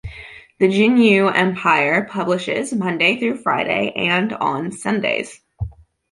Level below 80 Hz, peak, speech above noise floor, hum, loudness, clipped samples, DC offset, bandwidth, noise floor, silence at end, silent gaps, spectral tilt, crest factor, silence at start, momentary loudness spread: -46 dBFS; -2 dBFS; 22 dB; none; -17 LUFS; under 0.1%; under 0.1%; 11.5 kHz; -39 dBFS; 0.4 s; none; -5.5 dB/octave; 18 dB; 0.05 s; 18 LU